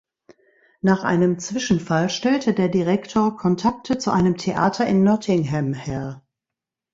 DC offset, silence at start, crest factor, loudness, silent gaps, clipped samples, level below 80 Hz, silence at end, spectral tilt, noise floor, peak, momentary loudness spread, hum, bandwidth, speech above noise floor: under 0.1%; 0.85 s; 18 dB; -21 LUFS; none; under 0.1%; -52 dBFS; 0.75 s; -6 dB/octave; -86 dBFS; -4 dBFS; 7 LU; none; 7.8 kHz; 67 dB